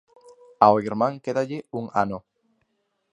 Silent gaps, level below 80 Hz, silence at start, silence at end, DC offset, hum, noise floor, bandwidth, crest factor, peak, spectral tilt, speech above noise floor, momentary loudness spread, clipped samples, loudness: none; -62 dBFS; 0.6 s; 0.95 s; under 0.1%; none; -73 dBFS; 10 kHz; 24 dB; 0 dBFS; -7 dB/octave; 51 dB; 12 LU; under 0.1%; -23 LUFS